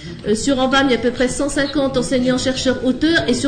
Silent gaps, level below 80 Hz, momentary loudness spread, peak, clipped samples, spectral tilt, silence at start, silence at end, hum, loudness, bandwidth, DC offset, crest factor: none; -36 dBFS; 4 LU; -6 dBFS; under 0.1%; -4 dB/octave; 0 s; 0 s; none; -17 LUFS; 9.6 kHz; under 0.1%; 12 dB